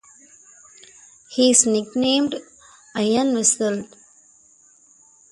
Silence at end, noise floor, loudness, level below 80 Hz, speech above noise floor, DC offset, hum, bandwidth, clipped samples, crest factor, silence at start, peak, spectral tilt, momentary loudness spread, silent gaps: 1.45 s; -54 dBFS; -19 LUFS; -64 dBFS; 35 dB; under 0.1%; none; 11.5 kHz; under 0.1%; 22 dB; 1.3 s; 0 dBFS; -2.5 dB/octave; 16 LU; none